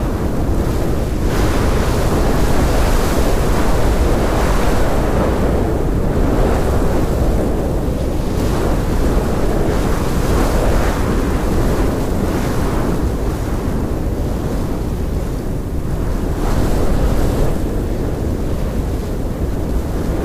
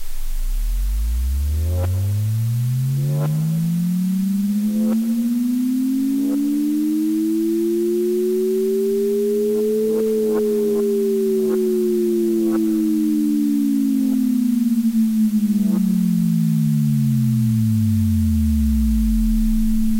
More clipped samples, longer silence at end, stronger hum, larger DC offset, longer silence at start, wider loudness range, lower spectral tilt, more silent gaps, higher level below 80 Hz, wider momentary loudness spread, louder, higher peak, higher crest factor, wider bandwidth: neither; about the same, 0 s vs 0 s; neither; neither; about the same, 0 s vs 0 s; about the same, 4 LU vs 2 LU; second, -6.5 dB/octave vs -8 dB/octave; neither; first, -18 dBFS vs -28 dBFS; about the same, 5 LU vs 3 LU; about the same, -18 LUFS vs -19 LUFS; first, -6 dBFS vs -10 dBFS; about the same, 10 dB vs 8 dB; about the same, 15.5 kHz vs 16 kHz